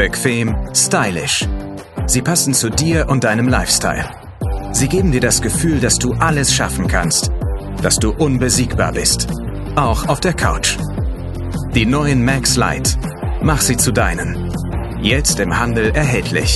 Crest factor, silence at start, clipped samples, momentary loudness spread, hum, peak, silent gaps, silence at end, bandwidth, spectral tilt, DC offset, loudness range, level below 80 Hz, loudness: 16 dB; 0 s; under 0.1%; 9 LU; none; 0 dBFS; none; 0 s; 12.5 kHz; -4 dB/octave; under 0.1%; 2 LU; -24 dBFS; -16 LUFS